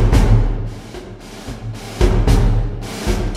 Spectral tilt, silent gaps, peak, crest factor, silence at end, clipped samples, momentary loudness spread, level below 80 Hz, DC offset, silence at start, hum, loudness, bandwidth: -6.5 dB/octave; none; 0 dBFS; 16 dB; 0 s; under 0.1%; 18 LU; -18 dBFS; under 0.1%; 0 s; none; -18 LUFS; 13.5 kHz